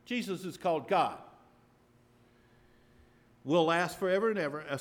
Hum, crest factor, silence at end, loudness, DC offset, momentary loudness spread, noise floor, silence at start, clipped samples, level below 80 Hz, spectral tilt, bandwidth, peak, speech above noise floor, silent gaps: none; 18 dB; 0 s; -31 LUFS; under 0.1%; 9 LU; -64 dBFS; 0.1 s; under 0.1%; -72 dBFS; -5.5 dB/octave; 18.5 kHz; -16 dBFS; 34 dB; none